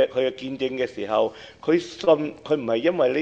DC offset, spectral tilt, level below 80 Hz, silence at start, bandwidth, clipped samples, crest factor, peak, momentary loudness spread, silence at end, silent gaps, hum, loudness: under 0.1%; -6 dB/octave; -62 dBFS; 0 s; 8.4 kHz; under 0.1%; 16 dB; -6 dBFS; 7 LU; 0 s; none; none; -24 LUFS